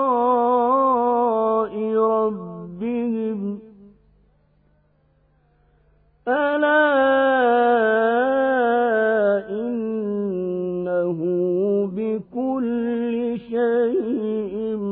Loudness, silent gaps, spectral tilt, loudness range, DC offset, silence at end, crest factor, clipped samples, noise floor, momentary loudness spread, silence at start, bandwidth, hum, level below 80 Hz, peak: -21 LUFS; none; -10.5 dB/octave; 12 LU; under 0.1%; 0 s; 16 dB; under 0.1%; -61 dBFS; 9 LU; 0 s; 4.1 kHz; none; -60 dBFS; -6 dBFS